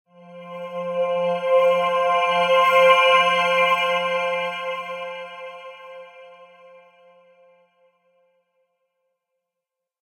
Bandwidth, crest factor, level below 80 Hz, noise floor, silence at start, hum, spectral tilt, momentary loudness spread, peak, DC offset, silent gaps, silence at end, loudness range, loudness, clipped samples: 15.5 kHz; 20 dB; -86 dBFS; -85 dBFS; 0.3 s; none; -3 dB/octave; 23 LU; -4 dBFS; under 0.1%; none; 3.6 s; 18 LU; -19 LUFS; under 0.1%